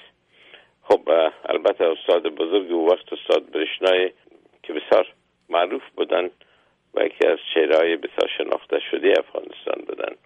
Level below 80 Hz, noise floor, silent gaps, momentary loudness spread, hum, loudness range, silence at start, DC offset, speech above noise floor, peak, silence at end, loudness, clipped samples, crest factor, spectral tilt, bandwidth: -70 dBFS; -61 dBFS; none; 11 LU; none; 3 LU; 0.9 s; under 0.1%; 40 dB; -6 dBFS; 0.1 s; -22 LUFS; under 0.1%; 16 dB; -4 dB/octave; 8.4 kHz